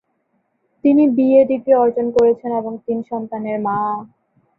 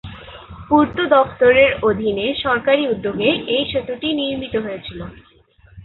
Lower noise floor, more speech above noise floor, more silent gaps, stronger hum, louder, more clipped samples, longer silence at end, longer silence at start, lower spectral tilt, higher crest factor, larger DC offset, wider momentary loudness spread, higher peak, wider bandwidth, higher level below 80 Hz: first, -67 dBFS vs -50 dBFS; first, 51 dB vs 33 dB; neither; neither; about the same, -17 LUFS vs -17 LUFS; neither; first, 0.55 s vs 0 s; first, 0.85 s vs 0.05 s; about the same, -9 dB/octave vs -9 dB/octave; about the same, 16 dB vs 18 dB; neither; second, 11 LU vs 20 LU; about the same, -2 dBFS vs -2 dBFS; first, 5.6 kHz vs 4.3 kHz; second, -60 dBFS vs -44 dBFS